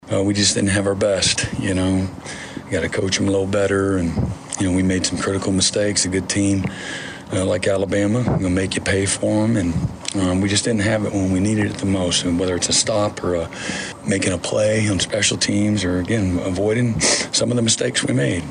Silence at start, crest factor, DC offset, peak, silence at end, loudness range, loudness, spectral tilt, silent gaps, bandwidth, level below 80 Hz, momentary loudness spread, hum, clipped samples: 0.05 s; 16 dB; under 0.1%; -4 dBFS; 0 s; 2 LU; -19 LUFS; -4 dB/octave; none; 11 kHz; -42 dBFS; 7 LU; none; under 0.1%